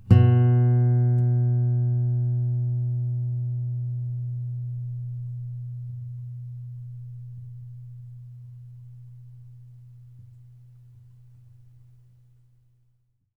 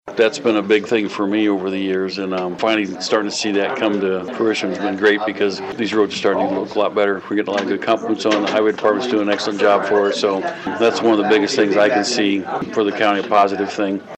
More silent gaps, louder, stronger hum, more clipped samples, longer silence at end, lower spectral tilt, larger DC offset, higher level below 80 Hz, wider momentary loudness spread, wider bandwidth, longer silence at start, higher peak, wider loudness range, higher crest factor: neither; second, -25 LUFS vs -18 LUFS; neither; neither; first, 2.4 s vs 0 s; first, -11 dB/octave vs -4.5 dB/octave; neither; first, -54 dBFS vs -66 dBFS; first, 25 LU vs 6 LU; second, 3.1 kHz vs 8.6 kHz; about the same, 0 s vs 0.05 s; about the same, -4 dBFS vs -2 dBFS; first, 24 LU vs 3 LU; first, 22 dB vs 16 dB